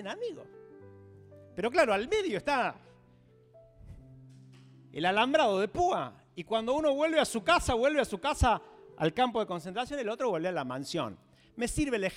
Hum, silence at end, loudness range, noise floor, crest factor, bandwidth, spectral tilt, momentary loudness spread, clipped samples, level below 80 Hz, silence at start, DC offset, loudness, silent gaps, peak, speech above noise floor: none; 0 s; 5 LU; -61 dBFS; 20 dB; 16 kHz; -4.5 dB/octave; 12 LU; under 0.1%; -48 dBFS; 0 s; under 0.1%; -30 LUFS; none; -12 dBFS; 31 dB